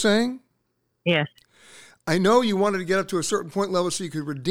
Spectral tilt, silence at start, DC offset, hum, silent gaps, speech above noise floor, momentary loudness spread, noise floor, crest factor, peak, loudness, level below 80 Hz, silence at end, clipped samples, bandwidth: -4.5 dB/octave; 0 s; under 0.1%; none; none; 51 dB; 11 LU; -73 dBFS; 18 dB; -6 dBFS; -23 LUFS; -62 dBFS; 0 s; under 0.1%; 16.5 kHz